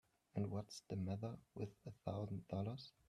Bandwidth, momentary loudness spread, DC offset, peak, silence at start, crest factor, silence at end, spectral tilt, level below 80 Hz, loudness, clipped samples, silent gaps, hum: 12 kHz; 6 LU; under 0.1%; -28 dBFS; 0.35 s; 18 dB; 0.2 s; -7.5 dB/octave; -76 dBFS; -48 LUFS; under 0.1%; none; none